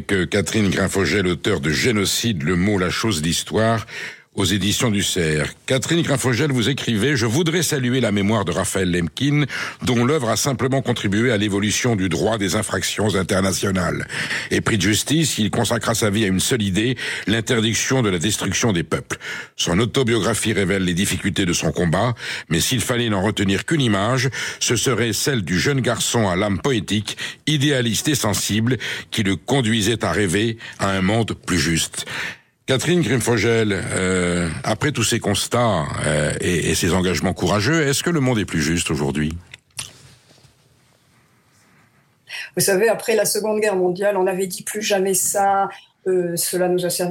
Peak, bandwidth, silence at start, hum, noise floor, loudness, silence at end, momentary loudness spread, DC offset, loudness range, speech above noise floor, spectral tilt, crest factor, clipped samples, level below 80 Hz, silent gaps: -6 dBFS; 17 kHz; 0 s; none; -57 dBFS; -19 LUFS; 0 s; 5 LU; under 0.1%; 2 LU; 38 dB; -4 dB/octave; 14 dB; under 0.1%; -48 dBFS; none